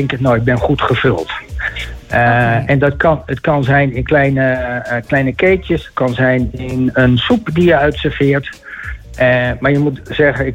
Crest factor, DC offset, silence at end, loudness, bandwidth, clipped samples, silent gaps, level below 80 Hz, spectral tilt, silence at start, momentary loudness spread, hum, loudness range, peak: 12 dB; under 0.1%; 0 s; -14 LUFS; 9.8 kHz; under 0.1%; none; -32 dBFS; -7.5 dB/octave; 0 s; 9 LU; none; 1 LU; -2 dBFS